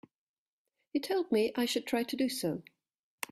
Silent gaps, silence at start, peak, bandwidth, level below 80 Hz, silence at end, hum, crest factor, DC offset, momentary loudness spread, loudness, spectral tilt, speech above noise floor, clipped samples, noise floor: none; 0.95 s; -18 dBFS; 15.5 kHz; -76 dBFS; 0.7 s; none; 18 dB; under 0.1%; 8 LU; -33 LUFS; -4 dB/octave; 53 dB; under 0.1%; -85 dBFS